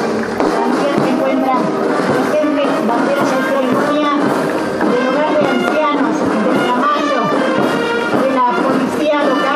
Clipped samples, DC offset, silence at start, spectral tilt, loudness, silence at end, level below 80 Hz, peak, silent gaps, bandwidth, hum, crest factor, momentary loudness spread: under 0.1%; under 0.1%; 0 s; -5.5 dB/octave; -14 LUFS; 0 s; -54 dBFS; 0 dBFS; none; 15 kHz; none; 14 dB; 2 LU